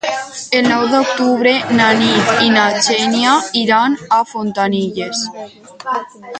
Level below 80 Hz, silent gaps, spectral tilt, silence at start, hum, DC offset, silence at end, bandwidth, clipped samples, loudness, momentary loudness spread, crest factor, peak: -58 dBFS; none; -3.5 dB/octave; 0.05 s; none; under 0.1%; 0 s; 9.4 kHz; under 0.1%; -14 LUFS; 11 LU; 14 dB; 0 dBFS